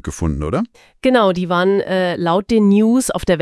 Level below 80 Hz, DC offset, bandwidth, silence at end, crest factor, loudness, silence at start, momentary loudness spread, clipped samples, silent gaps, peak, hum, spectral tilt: -36 dBFS; under 0.1%; 12 kHz; 0 s; 16 dB; -16 LUFS; 0.05 s; 8 LU; under 0.1%; none; 0 dBFS; none; -6 dB/octave